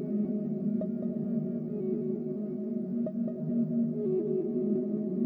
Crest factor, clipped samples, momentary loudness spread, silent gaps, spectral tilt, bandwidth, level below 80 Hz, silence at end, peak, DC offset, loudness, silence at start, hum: 14 dB; under 0.1%; 4 LU; none; -13.5 dB/octave; 2.4 kHz; -74 dBFS; 0 s; -18 dBFS; under 0.1%; -32 LUFS; 0 s; none